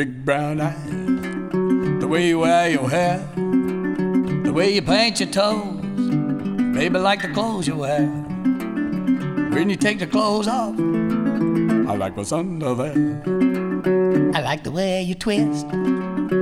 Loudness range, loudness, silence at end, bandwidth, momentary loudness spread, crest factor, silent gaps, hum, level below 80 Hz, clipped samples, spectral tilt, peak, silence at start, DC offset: 2 LU; -21 LUFS; 0 s; 14 kHz; 6 LU; 16 dB; none; none; -50 dBFS; under 0.1%; -5.5 dB/octave; -4 dBFS; 0 s; under 0.1%